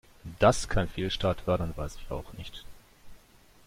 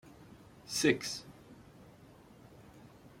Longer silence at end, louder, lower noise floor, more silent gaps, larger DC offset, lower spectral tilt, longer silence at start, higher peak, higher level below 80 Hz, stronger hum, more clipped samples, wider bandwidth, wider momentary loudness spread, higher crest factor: first, 0.5 s vs 0.1 s; first, -29 LUFS vs -33 LUFS; about the same, -58 dBFS vs -58 dBFS; neither; neither; first, -5 dB/octave vs -3.5 dB/octave; first, 0.25 s vs 0.05 s; first, -10 dBFS vs -14 dBFS; first, -42 dBFS vs -68 dBFS; neither; neither; about the same, 16 kHz vs 16.5 kHz; second, 19 LU vs 27 LU; about the same, 22 dB vs 24 dB